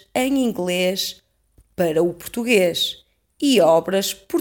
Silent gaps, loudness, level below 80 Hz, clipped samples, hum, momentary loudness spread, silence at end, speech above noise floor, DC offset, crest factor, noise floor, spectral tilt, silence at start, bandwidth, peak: none; -20 LUFS; -56 dBFS; under 0.1%; none; 10 LU; 0 s; 39 dB; under 0.1%; 16 dB; -58 dBFS; -4 dB/octave; 0.15 s; 19 kHz; -4 dBFS